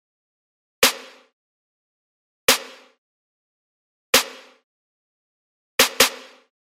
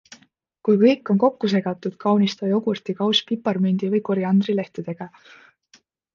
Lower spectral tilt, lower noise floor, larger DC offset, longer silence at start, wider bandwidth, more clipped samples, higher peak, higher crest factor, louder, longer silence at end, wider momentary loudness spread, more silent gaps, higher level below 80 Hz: second, 0.5 dB/octave vs -7 dB/octave; first, under -90 dBFS vs -58 dBFS; neither; first, 0.8 s vs 0.65 s; first, 16 kHz vs 7 kHz; neither; first, 0 dBFS vs -4 dBFS; first, 26 dB vs 18 dB; about the same, -19 LUFS vs -21 LUFS; second, 0.45 s vs 1.05 s; first, 16 LU vs 12 LU; first, 1.33-2.48 s, 2.98-4.13 s, 4.64-5.78 s vs none; first, -58 dBFS vs -70 dBFS